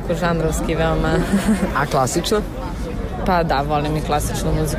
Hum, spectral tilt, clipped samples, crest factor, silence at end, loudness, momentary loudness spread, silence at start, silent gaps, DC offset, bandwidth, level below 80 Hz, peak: none; -5.5 dB/octave; under 0.1%; 12 dB; 0 s; -20 LUFS; 8 LU; 0 s; none; under 0.1%; 16 kHz; -28 dBFS; -8 dBFS